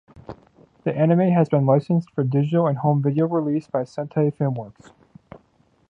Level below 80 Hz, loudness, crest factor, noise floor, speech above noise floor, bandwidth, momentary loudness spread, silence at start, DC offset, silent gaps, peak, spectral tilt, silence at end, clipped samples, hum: -62 dBFS; -21 LUFS; 18 dB; -61 dBFS; 41 dB; 7.2 kHz; 13 LU; 0.15 s; under 0.1%; none; -4 dBFS; -10.5 dB/octave; 1.2 s; under 0.1%; none